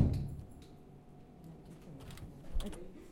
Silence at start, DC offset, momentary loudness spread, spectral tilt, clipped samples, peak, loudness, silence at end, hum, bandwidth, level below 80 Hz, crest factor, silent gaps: 0 s; under 0.1%; 15 LU; -7.5 dB/octave; under 0.1%; -16 dBFS; -45 LUFS; 0 s; none; 16 kHz; -46 dBFS; 24 dB; none